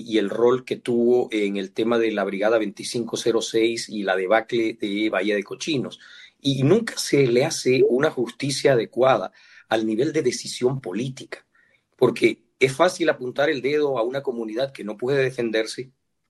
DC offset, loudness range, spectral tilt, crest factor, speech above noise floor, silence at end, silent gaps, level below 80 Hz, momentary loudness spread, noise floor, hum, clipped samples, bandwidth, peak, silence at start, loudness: under 0.1%; 3 LU; -5 dB/octave; 18 dB; 40 dB; 0.45 s; none; -66 dBFS; 9 LU; -62 dBFS; none; under 0.1%; 12.5 kHz; -4 dBFS; 0 s; -22 LUFS